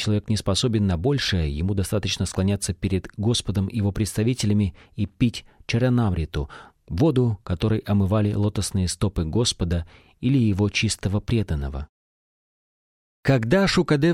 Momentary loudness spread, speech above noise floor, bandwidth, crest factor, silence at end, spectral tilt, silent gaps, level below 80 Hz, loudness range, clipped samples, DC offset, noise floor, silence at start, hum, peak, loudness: 9 LU; over 68 dB; 14.5 kHz; 16 dB; 0 s; -5.5 dB/octave; 11.89-13.23 s; -38 dBFS; 2 LU; under 0.1%; under 0.1%; under -90 dBFS; 0 s; none; -6 dBFS; -23 LUFS